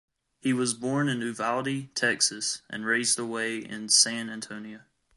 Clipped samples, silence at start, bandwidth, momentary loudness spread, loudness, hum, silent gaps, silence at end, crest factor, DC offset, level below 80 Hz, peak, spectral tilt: under 0.1%; 0.45 s; 11.5 kHz; 15 LU; -26 LUFS; none; none; 0.4 s; 22 dB; under 0.1%; -74 dBFS; -8 dBFS; -2 dB/octave